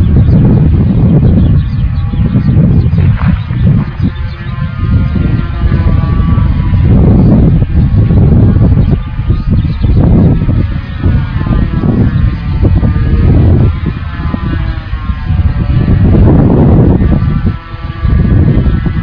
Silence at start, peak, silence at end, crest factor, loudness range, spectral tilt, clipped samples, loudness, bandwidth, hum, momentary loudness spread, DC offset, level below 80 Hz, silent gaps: 0 s; 0 dBFS; 0 s; 8 dB; 3 LU; -11.5 dB/octave; 0.7%; -9 LUFS; 5.2 kHz; none; 9 LU; under 0.1%; -14 dBFS; none